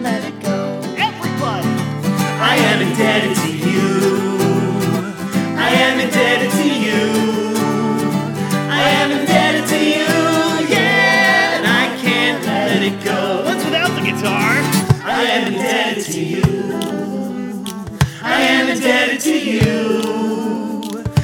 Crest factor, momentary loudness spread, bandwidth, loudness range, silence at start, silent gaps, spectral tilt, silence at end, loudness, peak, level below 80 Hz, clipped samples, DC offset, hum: 16 dB; 8 LU; 19 kHz; 4 LU; 0 s; none; -4.5 dB/octave; 0 s; -16 LUFS; 0 dBFS; -44 dBFS; under 0.1%; under 0.1%; none